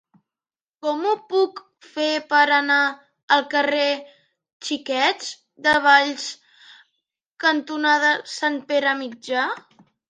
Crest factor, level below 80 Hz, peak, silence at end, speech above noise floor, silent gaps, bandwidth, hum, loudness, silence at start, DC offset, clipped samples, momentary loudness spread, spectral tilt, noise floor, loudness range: 20 dB; -68 dBFS; -2 dBFS; 0.5 s; over 69 dB; 3.23-3.28 s, 4.53-4.60 s, 7.31-7.35 s; 10.5 kHz; none; -20 LUFS; 0.85 s; under 0.1%; under 0.1%; 14 LU; -1.5 dB/octave; under -90 dBFS; 2 LU